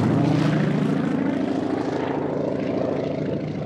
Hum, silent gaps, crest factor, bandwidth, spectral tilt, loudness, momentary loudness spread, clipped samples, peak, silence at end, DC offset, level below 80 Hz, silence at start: none; none; 14 dB; 9.8 kHz; -8 dB/octave; -23 LUFS; 5 LU; under 0.1%; -8 dBFS; 0 s; under 0.1%; -58 dBFS; 0 s